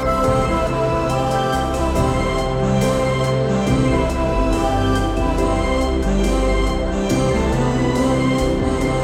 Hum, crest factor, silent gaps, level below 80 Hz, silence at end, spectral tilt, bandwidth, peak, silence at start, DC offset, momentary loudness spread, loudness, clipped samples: none; 12 dB; none; -24 dBFS; 0 s; -6 dB/octave; 16 kHz; -4 dBFS; 0 s; under 0.1%; 2 LU; -18 LUFS; under 0.1%